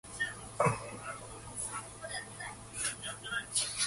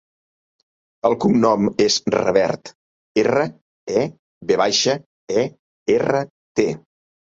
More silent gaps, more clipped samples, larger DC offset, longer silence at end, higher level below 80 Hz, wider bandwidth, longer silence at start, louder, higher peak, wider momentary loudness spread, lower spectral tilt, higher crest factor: second, none vs 2.75-3.15 s, 3.61-3.87 s, 4.19-4.41 s, 5.06-5.28 s, 5.59-5.86 s, 6.30-6.55 s; neither; neither; second, 0 s vs 0.6 s; about the same, -60 dBFS vs -58 dBFS; first, 12 kHz vs 7.8 kHz; second, 0.05 s vs 1.05 s; second, -37 LUFS vs -20 LUFS; second, -16 dBFS vs -2 dBFS; about the same, 11 LU vs 11 LU; second, -2 dB/octave vs -4.5 dB/octave; about the same, 22 dB vs 20 dB